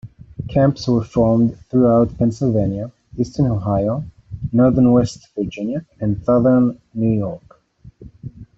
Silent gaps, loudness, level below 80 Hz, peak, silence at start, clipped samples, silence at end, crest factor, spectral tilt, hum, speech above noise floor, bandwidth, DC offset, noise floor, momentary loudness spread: none; -18 LUFS; -42 dBFS; -2 dBFS; 0.05 s; under 0.1%; 0.15 s; 16 dB; -9 dB/octave; none; 29 dB; 7.8 kHz; under 0.1%; -46 dBFS; 17 LU